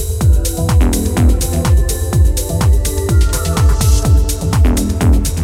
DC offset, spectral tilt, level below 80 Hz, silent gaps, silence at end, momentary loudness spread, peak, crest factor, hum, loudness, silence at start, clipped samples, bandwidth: under 0.1%; -5.5 dB/octave; -14 dBFS; none; 0 s; 2 LU; 0 dBFS; 12 dB; none; -14 LUFS; 0 s; under 0.1%; 16.5 kHz